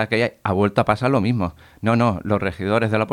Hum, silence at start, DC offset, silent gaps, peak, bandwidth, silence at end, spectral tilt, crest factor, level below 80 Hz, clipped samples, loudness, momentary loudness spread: none; 0 s; under 0.1%; none; -2 dBFS; 12 kHz; 0 s; -7.5 dB/octave; 18 dB; -48 dBFS; under 0.1%; -20 LUFS; 5 LU